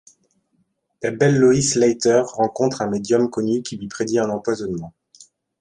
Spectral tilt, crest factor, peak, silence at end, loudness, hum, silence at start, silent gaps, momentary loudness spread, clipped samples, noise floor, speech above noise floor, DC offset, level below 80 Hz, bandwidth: -5 dB/octave; 16 dB; -4 dBFS; 0.7 s; -19 LUFS; none; 1 s; none; 13 LU; under 0.1%; -67 dBFS; 49 dB; under 0.1%; -56 dBFS; 11.5 kHz